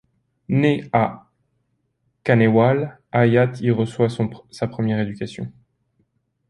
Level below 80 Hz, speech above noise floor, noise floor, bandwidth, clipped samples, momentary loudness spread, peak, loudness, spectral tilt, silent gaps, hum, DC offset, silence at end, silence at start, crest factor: -56 dBFS; 51 dB; -70 dBFS; 11 kHz; under 0.1%; 13 LU; -2 dBFS; -20 LUFS; -8 dB/octave; none; none; under 0.1%; 1 s; 0.5 s; 20 dB